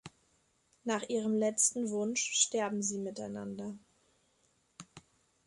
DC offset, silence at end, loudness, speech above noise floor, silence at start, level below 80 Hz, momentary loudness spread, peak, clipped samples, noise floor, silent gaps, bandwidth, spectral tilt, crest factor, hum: under 0.1%; 0.45 s; -33 LUFS; 40 dB; 0.05 s; -76 dBFS; 16 LU; -14 dBFS; under 0.1%; -73 dBFS; none; 11.5 kHz; -2.5 dB/octave; 22 dB; none